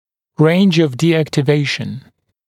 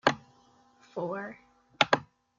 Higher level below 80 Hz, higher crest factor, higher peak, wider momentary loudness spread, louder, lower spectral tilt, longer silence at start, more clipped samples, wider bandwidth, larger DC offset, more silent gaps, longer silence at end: first, -58 dBFS vs -70 dBFS; second, 16 dB vs 30 dB; first, 0 dBFS vs -4 dBFS; about the same, 16 LU vs 17 LU; first, -15 LUFS vs -30 LUFS; first, -6.5 dB/octave vs -3.5 dB/octave; first, 0.4 s vs 0.05 s; neither; first, 13.5 kHz vs 9 kHz; neither; neither; about the same, 0.45 s vs 0.35 s